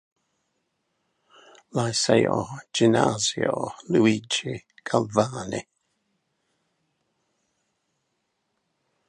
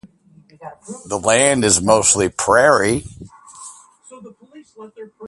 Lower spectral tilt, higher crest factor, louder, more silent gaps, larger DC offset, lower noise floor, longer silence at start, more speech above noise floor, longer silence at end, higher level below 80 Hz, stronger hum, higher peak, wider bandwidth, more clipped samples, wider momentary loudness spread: first, -4.5 dB/octave vs -3 dB/octave; first, 24 dB vs 18 dB; second, -24 LUFS vs -14 LUFS; neither; neither; first, -76 dBFS vs -50 dBFS; first, 1.75 s vs 0.6 s; first, 53 dB vs 35 dB; first, 3.45 s vs 0 s; second, -62 dBFS vs -46 dBFS; neither; second, -4 dBFS vs 0 dBFS; about the same, 11.5 kHz vs 11.5 kHz; neither; second, 12 LU vs 25 LU